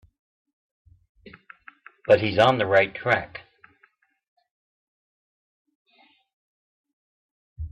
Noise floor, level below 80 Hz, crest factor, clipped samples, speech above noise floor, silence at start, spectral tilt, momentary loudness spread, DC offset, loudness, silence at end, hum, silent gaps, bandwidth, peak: -64 dBFS; -54 dBFS; 22 dB; under 0.1%; 44 dB; 1.25 s; -3 dB/octave; 22 LU; under 0.1%; -21 LUFS; 0.05 s; none; 4.28-4.37 s, 4.51-5.65 s, 5.75-5.85 s, 6.33-6.84 s, 6.93-7.56 s; 8 kHz; -6 dBFS